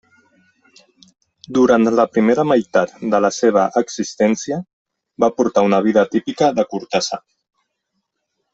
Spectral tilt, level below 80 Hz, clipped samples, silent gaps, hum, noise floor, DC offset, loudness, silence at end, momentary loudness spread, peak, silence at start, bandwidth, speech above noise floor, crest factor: -5 dB/octave; -58 dBFS; under 0.1%; 4.73-4.85 s; none; -74 dBFS; under 0.1%; -17 LUFS; 1.35 s; 8 LU; -2 dBFS; 1.5 s; 8 kHz; 58 dB; 16 dB